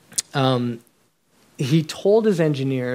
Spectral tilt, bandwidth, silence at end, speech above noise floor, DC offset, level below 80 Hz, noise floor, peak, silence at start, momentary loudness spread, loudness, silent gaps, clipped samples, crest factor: -5.5 dB/octave; 16 kHz; 0 s; 43 dB; under 0.1%; -68 dBFS; -63 dBFS; -4 dBFS; 0.15 s; 11 LU; -21 LUFS; none; under 0.1%; 18 dB